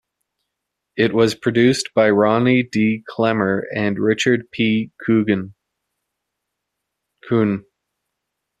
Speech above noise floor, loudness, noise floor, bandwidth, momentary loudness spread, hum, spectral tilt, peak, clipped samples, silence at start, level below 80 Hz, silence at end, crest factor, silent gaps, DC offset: 62 dB; -18 LUFS; -80 dBFS; 12.5 kHz; 7 LU; none; -6 dB/octave; -2 dBFS; under 0.1%; 0.95 s; -58 dBFS; 1 s; 18 dB; none; under 0.1%